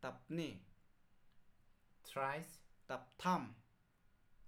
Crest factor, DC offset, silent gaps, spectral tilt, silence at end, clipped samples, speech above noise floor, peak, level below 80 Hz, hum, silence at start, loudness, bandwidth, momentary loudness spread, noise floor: 22 dB; under 0.1%; none; -5.5 dB/octave; 0 s; under 0.1%; 29 dB; -26 dBFS; -74 dBFS; none; 0 s; -44 LUFS; 18 kHz; 19 LU; -73 dBFS